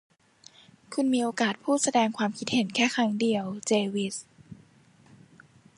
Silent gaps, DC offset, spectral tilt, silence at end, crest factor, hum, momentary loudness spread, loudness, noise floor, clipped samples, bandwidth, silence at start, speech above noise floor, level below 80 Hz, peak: none; under 0.1%; -3.5 dB/octave; 1.25 s; 18 dB; none; 7 LU; -27 LUFS; -58 dBFS; under 0.1%; 11.5 kHz; 0.9 s; 32 dB; -72 dBFS; -10 dBFS